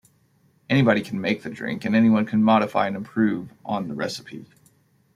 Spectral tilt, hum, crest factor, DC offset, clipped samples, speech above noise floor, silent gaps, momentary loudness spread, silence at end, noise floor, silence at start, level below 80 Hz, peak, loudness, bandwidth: -7 dB/octave; none; 18 dB; under 0.1%; under 0.1%; 40 dB; none; 12 LU; 0.75 s; -62 dBFS; 0.7 s; -64 dBFS; -4 dBFS; -22 LUFS; 11.5 kHz